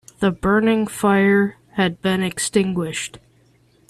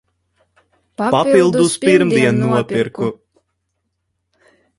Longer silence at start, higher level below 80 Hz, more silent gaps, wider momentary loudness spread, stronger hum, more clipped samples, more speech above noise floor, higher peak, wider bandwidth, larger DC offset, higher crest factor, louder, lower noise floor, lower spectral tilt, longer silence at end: second, 0.2 s vs 1 s; first, -48 dBFS vs -56 dBFS; neither; second, 8 LU vs 11 LU; neither; neither; second, 38 dB vs 58 dB; second, -4 dBFS vs 0 dBFS; first, 13.5 kHz vs 11.5 kHz; neither; about the same, 16 dB vs 18 dB; second, -19 LUFS vs -15 LUFS; second, -56 dBFS vs -72 dBFS; about the same, -5 dB/octave vs -5.5 dB/octave; second, 0.75 s vs 1.65 s